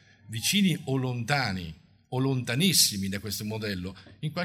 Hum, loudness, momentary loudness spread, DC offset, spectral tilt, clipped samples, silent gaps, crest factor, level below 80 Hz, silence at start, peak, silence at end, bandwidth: none; -27 LUFS; 15 LU; under 0.1%; -3.5 dB/octave; under 0.1%; none; 20 dB; -60 dBFS; 0.3 s; -8 dBFS; 0 s; 16 kHz